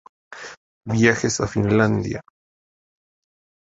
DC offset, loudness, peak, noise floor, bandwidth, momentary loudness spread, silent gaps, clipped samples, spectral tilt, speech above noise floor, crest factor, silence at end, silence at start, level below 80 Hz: under 0.1%; -20 LUFS; -2 dBFS; under -90 dBFS; 8 kHz; 20 LU; 0.57-0.81 s; under 0.1%; -5.5 dB/octave; over 71 dB; 22 dB; 1.4 s; 0.3 s; -48 dBFS